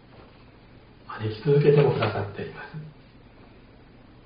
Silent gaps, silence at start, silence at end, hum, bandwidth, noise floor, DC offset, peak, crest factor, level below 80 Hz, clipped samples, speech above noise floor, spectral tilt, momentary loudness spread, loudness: none; 1.1 s; 1.35 s; none; 5.2 kHz; -51 dBFS; under 0.1%; -6 dBFS; 20 dB; -56 dBFS; under 0.1%; 27 dB; -6.5 dB/octave; 22 LU; -23 LUFS